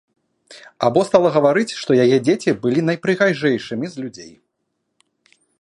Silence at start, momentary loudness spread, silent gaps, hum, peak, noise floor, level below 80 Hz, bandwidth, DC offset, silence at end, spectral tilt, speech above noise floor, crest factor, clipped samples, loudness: 0.5 s; 12 LU; none; none; 0 dBFS; -73 dBFS; -64 dBFS; 11.5 kHz; under 0.1%; 1.35 s; -6 dB/octave; 56 dB; 18 dB; under 0.1%; -17 LUFS